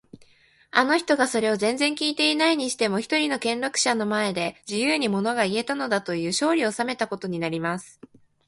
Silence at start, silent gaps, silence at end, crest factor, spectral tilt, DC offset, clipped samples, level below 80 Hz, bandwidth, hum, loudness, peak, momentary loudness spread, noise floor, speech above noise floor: 0.75 s; none; 0.55 s; 22 dB; -3.5 dB/octave; under 0.1%; under 0.1%; -68 dBFS; 11.5 kHz; none; -24 LUFS; -2 dBFS; 7 LU; -58 dBFS; 34 dB